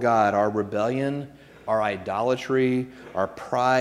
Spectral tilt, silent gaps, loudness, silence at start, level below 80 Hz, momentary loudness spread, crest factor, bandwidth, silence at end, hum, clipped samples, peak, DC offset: -6.5 dB/octave; none; -25 LUFS; 0 s; -62 dBFS; 10 LU; 16 dB; 13 kHz; 0 s; none; under 0.1%; -8 dBFS; under 0.1%